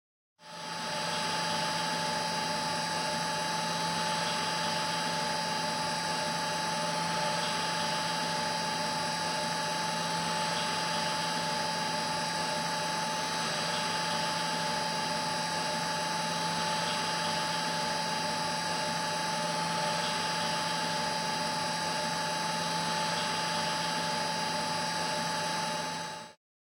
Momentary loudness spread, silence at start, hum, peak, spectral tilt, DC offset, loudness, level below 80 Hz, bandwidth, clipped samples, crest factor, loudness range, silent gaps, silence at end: 1 LU; 0.4 s; none; -20 dBFS; -2.5 dB/octave; under 0.1%; -31 LUFS; -70 dBFS; 16.5 kHz; under 0.1%; 12 dB; 0 LU; none; 0.45 s